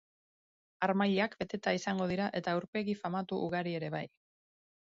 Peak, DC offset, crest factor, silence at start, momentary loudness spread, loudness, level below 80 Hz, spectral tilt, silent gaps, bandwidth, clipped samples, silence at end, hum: -16 dBFS; under 0.1%; 20 dB; 0.8 s; 7 LU; -34 LUFS; -70 dBFS; -4.5 dB/octave; 2.68-2.73 s; 7.6 kHz; under 0.1%; 0.9 s; none